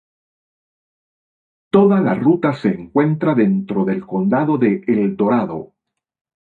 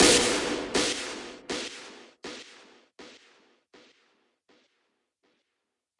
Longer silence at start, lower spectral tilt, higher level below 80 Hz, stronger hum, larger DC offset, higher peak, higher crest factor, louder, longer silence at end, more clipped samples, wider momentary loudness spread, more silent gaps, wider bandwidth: first, 1.75 s vs 0 s; first, -10 dB/octave vs -1.5 dB/octave; about the same, -58 dBFS vs -56 dBFS; neither; neither; first, -2 dBFS vs -6 dBFS; second, 16 dB vs 26 dB; first, -17 LUFS vs -27 LUFS; second, 0.75 s vs 2.9 s; neither; second, 6 LU vs 26 LU; neither; second, 4.5 kHz vs 11.5 kHz